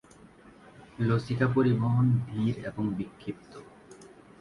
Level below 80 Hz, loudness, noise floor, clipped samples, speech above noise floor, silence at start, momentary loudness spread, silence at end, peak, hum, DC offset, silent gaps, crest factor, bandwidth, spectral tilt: -58 dBFS; -28 LUFS; -54 dBFS; under 0.1%; 26 dB; 0.8 s; 17 LU; 0.35 s; -12 dBFS; none; under 0.1%; none; 16 dB; 10.5 kHz; -9 dB/octave